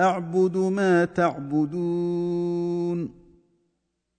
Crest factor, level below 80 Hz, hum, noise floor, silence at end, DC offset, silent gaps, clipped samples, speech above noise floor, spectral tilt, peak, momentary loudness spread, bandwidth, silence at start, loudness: 16 dB; -62 dBFS; none; -76 dBFS; 1.05 s; under 0.1%; none; under 0.1%; 54 dB; -7.5 dB/octave; -8 dBFS; 6 LU; 9.4 kHz; 0 s; -24 LUFS